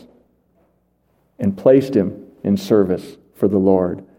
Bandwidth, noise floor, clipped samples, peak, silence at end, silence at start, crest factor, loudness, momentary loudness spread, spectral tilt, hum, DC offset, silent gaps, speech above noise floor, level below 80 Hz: 16.5 kHz; -63 dBFS; under 0.1%; 0 dBFS; 0.15 s; 1.4 s; 18 dB; -18 LUFS; 11 LU; -8.5 dB/octave; none; under 0.1%; none; 46 dB; -58 dBFS